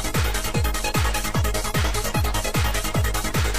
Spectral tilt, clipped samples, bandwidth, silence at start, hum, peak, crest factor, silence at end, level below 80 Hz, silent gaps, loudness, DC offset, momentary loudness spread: -4 dB/octave; under 0.1%; 15.5 kHz; 0 s; none; -8 dBFS; 14 dB; 0 s; -26 dBFS; none; -23 LUFS; 2%; 1 LU